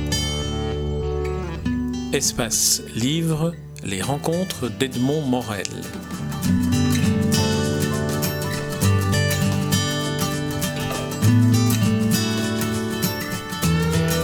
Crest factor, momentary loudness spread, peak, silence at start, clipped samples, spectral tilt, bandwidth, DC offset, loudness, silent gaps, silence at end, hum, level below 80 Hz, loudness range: 20 dB; 8 LU; 0 dBFS; 0 s; under 0.1%; -4.5 dB/octave; over 20 kHz; under 0.1%; -22 LUFS; none; 0 s; none; -38 dBFS; 3 LU